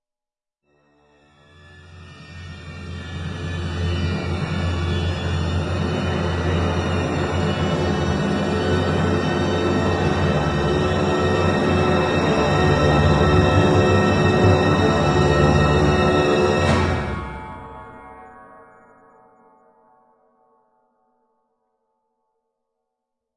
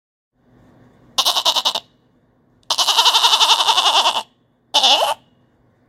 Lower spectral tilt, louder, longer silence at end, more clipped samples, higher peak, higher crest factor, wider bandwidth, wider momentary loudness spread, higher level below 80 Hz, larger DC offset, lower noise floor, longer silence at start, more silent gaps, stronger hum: first, -6.5 dB/octave vs 2 dB/octave; second, -19 LUFS vs -14 LUFS; first, 4.9 s vs 0.75 s; neither; second, -4 dBFS vs 0 dBFS; about the same, 18 dB vs 18 dB; second, 11 kHz vs 17 kHz; first, 16 LU vs 11 LU; first, -36 dBFS vs -68 dBFS; neither; first, -88 dBFS vs -58 dBFS; first, 1.9 s vs 1.2 s; neither; neither